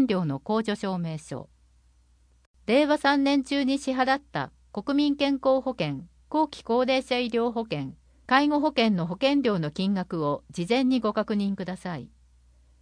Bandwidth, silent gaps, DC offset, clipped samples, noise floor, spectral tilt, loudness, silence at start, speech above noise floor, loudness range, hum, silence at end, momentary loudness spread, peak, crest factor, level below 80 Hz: 10.5 kHz; 2.46-2.54 s; under 0.1%; under 0.1%; -61 dBFS; -6 dB/octave; -26 LUFS; 0 s; 36 dB; 2 LU; none; 0.75 s; 12 LU; -8 dBFS; 18 dB; -58 dBFS